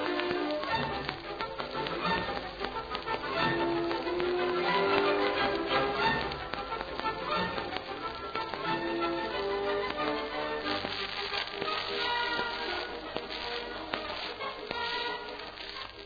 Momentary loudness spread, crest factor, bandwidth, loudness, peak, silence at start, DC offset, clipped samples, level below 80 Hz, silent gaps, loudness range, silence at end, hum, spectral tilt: 8 LU; 24 dB; 5 kHz; -32 LUFS; -8 dBFS; 0 s; under 0.1%; under 0.1%; -54 dBFS; none; 4 LU; 0 s; none; -5.5 dB/octave